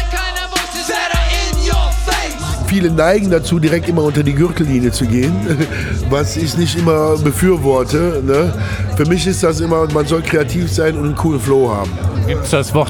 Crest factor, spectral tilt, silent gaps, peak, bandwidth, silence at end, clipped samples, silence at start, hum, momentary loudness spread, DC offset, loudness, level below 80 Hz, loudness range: 12 dB; -5.5 dB/octave; none; -2 dBFS; 19.5 kHz; 0 s; under 0.1%; 0 s; none; 5 LU; 0.1%; -15 LUFS; -24 dBFS; 1 LU